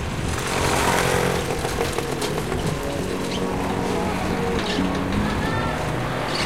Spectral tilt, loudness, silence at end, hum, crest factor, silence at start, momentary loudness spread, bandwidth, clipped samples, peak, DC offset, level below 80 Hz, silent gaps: -4.5 dB/octave; -23 LUFS; 0 s; none; 18 dB; 0 s; 6 LU; 16 kHz; under 0.1%; -6 dBFS; 0.9%; -36 dBFS; none